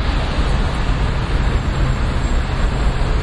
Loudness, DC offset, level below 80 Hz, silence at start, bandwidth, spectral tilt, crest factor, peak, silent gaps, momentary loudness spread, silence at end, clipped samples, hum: -20 LUFS; under 0.1%; -18 dBFS; 0 s; 11 kHz; -6 dB/octave; 12 dB; -6 dBFS; none; 1 LU; 0 s; under 0.1%; none